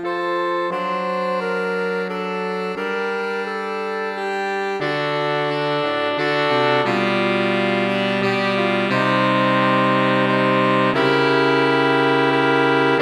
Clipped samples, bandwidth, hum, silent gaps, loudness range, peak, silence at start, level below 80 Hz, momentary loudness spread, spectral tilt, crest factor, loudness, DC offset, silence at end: under 0.1%; 13 kHz; none; none; 7 LU; -4 dBFS; 0 s; -66 dBFS; 7 LU; -6 dB/octave; 16 dB; -19 LUFS; under 0.1%; 0 s